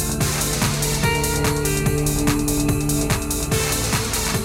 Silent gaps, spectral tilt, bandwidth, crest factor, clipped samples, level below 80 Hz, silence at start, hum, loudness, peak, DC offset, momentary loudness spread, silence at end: none; -4 dB/octave; 17 kHz; 18 dB; under 0.1%; -30 dBFS; 0 s; none; -20 LUFS; -2 dBFS; under 0.1%; 2 LU; 0 s